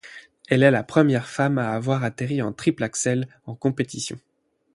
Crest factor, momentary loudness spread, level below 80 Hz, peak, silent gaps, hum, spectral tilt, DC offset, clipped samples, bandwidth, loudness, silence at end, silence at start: 20 dB; 14 LU; -62 dBFS; -2 dBFS; none; none; -5.5 dB/octave; under 0.1%; under 0.1%; 11.5 kHz; -23 LUFS; 0.55 s; 0.05 s